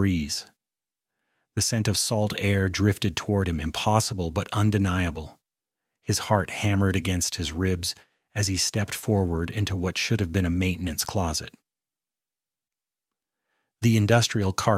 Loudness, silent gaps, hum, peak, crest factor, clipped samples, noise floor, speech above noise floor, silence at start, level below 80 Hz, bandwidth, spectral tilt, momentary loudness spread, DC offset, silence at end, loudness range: -25 LUFS; none; none; -4 dBFS; 22 dB; under 0.1%; under -90 dBFS; over 65 dB; 0 s; -48 dBFS; 15.5 kHz; -4.5 dB/octave; 7 LU; under 0.1%; 0 s; 4 LU